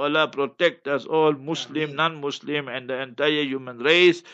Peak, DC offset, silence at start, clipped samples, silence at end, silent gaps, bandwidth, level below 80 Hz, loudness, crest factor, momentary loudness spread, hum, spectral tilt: -4 dBFS; under 0.1%; 0 s; under 0.1%; 0 s; none; 8 kHz; -78 dBFS; -23 LUFS; 20 dB; 12 LU; none; -4.5 dB/octave